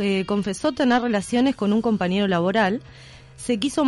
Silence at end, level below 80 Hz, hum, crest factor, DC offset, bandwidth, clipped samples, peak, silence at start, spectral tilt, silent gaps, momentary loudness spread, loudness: 0 s; -52 dBFS; none; 12 dB; under 0.1%; 12 kHz; under 0.1%; -8 dBFS; 0 s; -5.5 dB/octave; none; 5 LU; -22 LUFS